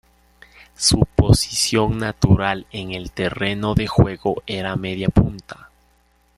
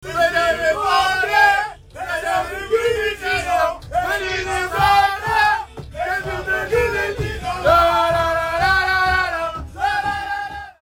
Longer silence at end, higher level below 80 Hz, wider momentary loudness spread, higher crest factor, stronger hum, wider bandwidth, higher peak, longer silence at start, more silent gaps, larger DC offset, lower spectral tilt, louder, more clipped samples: first, 0.85 s vs 0.1 s; first, -32 dBFS vs -38 dBFS; about the same, 11 LU vs 10 LU; about the same, 20 dB vs 16 dB; neither; second, 13.5 kHz vs 17.5 kHz; about the same, 0 dBFS vs -2 dBFS; first, 0.8 s vs 0 s; neither; neither; first, -5 dB/octave vs -3.5 dB/octave; about the same, -19 LUFS vs -18 LUFS; neither